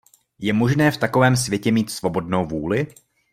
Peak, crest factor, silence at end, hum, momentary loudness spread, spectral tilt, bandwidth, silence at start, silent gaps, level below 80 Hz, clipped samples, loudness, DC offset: -4 dBFS; 18 dB; 0.45 s; none; 7 LU; -5.5 dB/octave; 16 kHz; 0.4 s; none; -52 dBFS; under 0.1%; -20 LUFS; under 0.1%